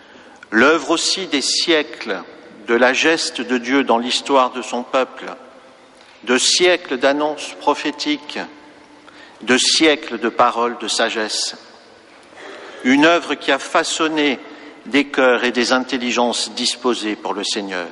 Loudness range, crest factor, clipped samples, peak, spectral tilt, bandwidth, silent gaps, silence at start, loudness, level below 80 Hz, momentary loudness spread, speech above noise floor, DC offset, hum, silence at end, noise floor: 2 LU; 16 dB; under 0.1%; -2 dBFS; -1.5 dB/octave; 11.5 kHz; none; 0.5 s; -17 LUFS; -64 dBFS; 14 LU; 28 dB; under 0.1%; none; 0 s; -45 dBFS